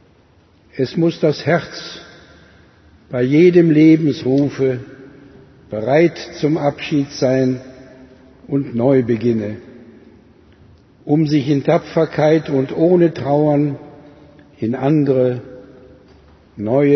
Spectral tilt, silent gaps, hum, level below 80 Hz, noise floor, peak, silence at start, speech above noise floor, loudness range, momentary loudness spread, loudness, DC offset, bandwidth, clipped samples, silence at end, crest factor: -8 dB/octave; none; none; -56 dBFS; -51 dBFS; 0 dBFS; 0.75 s; 36 dB; 5 LU; 16 LU; -16 LUFS; under 0.1%; 6.4 kHz; under 0.1%; 0 s; 16 dB